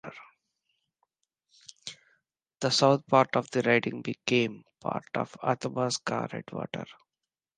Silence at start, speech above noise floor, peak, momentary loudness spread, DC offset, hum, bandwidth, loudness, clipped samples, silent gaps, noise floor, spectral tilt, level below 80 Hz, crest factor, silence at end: 0.05 s; 62 dB; -6 dBFS; 20 LU; under 0.1%; none; 10 kHz; -28 LUFS; under 0.1%; none; -90 dBFS; -4.5 dB/octave; -72 dBFS; 24 dB; 0.65 s